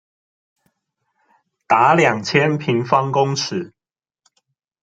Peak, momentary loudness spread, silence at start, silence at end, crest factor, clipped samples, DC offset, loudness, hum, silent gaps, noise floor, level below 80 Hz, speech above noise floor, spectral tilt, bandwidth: -2 dBFS; 11 LU; 1.7 s; 1.15 s; 18 dB; under 0.1%; under 0.1%; -17 LUFS; none; none; under -90 dBFS; -62 dBFS; over 73 dB; -5 dB/octave; 9.2 kHz